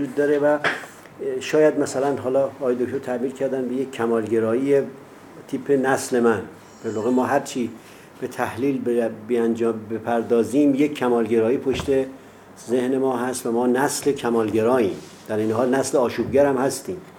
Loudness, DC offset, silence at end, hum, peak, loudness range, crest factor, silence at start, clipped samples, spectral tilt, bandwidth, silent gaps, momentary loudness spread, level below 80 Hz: -22 LUFS; under 0.1%; 0 s; none; -4 dBFS; 3 LU; 18 dB; 0 s; under 0.1%; -5 dB/octave; 17.5 kHz; none; 11 LU; -56 dBFS